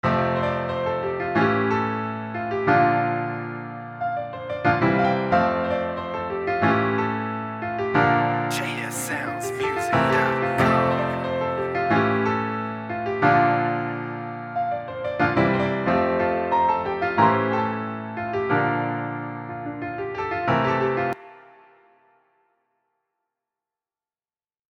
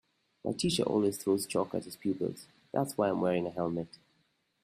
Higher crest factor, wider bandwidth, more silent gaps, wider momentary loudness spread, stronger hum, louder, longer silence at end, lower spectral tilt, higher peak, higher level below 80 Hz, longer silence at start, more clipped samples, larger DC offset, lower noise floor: about the same, 20 dB vs 16 dB; about the same, 16 kHz vs 15.5 kHz; neither; about the same, 11 LU vs 9 LU; neither; first, -23 LUFS vs -32 LUFS; first, 3.3 s vs 0.75 s; about the same, -6 dB/octave vs -5 dB/octave; first, -4 dBFS vs -16 dBFS; first, -54 dBFS vs -66 dBFS; second, 0.05 s vs 0.45 s; neither; neither; first, under -90 dBFS vs -74 dBFS